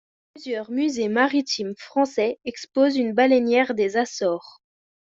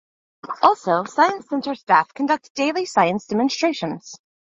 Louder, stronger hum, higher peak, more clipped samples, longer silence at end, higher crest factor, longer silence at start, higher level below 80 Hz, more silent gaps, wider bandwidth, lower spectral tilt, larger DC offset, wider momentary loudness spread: about the same, -22 LUFS vs -20 LUFS; neither; about the same, -4 dBFS vs -2 dBFS; neither; first, 0.65 s vs 0.35 s; about the same, 18 dB vs 20 dB; about the same, 0.35 s vs 0.45 s; about the same, -68 dBFS vs -68 dBFS; second, none vs 2.50-2.55 s; about the same, 7.8 kHz vs 8 kHz; about the same, -4 dB/octave vs -4.5 dB/octave; neither; about the same, 12 LU vs 10 LU